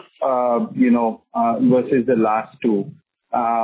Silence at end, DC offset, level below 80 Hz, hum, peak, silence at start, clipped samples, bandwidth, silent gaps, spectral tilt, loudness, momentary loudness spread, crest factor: 0 s; under 0.1%; -62 dBFS; none; -6 dBFS; 0.2 s; under 0.1%; 4 kHz; none; -11.5 dB/octave; -19 LUFS; 6 LU; 12 dB